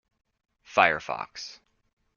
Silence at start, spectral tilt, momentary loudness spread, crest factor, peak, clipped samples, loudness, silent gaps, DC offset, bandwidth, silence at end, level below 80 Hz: 0.7 s; -3 dB/octave; 18 LU; 28 dB; -2 dBFS; under 0.1%; -25 LUFS; none; under 0.1%; 7.2 kHz; 0.65 s; -66 dBFS